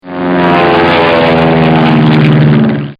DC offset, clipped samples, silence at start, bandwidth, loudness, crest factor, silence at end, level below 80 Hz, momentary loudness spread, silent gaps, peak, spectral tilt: under 0.1%; 1%; 0.05 s; 5.4 kHz; -7 LUFS; 8 dB; 0.05 s; -36 dBFS; 3 LU; none; 0 dBFS; -8.5 dB/octave